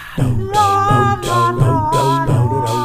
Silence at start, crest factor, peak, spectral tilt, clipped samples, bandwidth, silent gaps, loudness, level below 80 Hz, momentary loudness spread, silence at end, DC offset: 0 s; 14 dB; -2 dBFS; -6 dB/octave; under 0.1%; 15.5 kHz; none; -15 LUFS; -32 dBFS; 4 LU; 0 s; under 0.1%